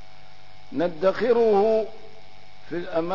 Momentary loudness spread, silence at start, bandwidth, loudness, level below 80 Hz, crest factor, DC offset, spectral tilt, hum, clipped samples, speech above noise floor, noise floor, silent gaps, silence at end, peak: 15 LU; 0.7 s; 6 kHz; -23 LUFS; -58 dBFS; 16 dB; 2%; -7 dB/octave; 50 Hz at -60 dBFS; under 0.1%; 29 dB; -51 dBFS; none; 0 s; -10 dBFS